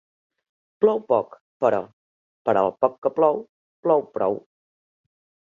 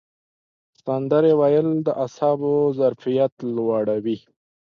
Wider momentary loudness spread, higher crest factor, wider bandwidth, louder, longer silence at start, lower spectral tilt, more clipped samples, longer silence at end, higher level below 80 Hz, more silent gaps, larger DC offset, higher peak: about the same, 10 LU vs 10 LU; first, 22 dB vs 16 dB; about the same, 7.2 kHz vs 6.8 kHz; about the same, -23 LUFS vs -21 LUFS; about the same, 0.8 s vs 0.85 s; about the same, -8.5 dB/octave vs -8.5 dB/octave; neither; first, 1.2 s vs 0.5 s; about the same, -70 dBFS vs -70 dBFS; first, 1.41-1.60 s, 1.93-2.45 s, 2.98-3.02 s, 3.49-3.83 s vs 3.32-3.37 s; neither; about the same, -4 dBFS vs -6 dBFS